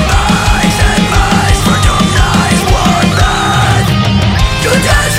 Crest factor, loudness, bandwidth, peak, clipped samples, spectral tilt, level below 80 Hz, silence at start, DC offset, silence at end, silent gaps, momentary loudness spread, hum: 8 dB; -9 LUFS; 16.5 kHz; 0 dBFS; under 0.1%; -4.5 dB/octave; -16 dBFS; 0 s; under 0.1%; 0 s; none; 1 LU; none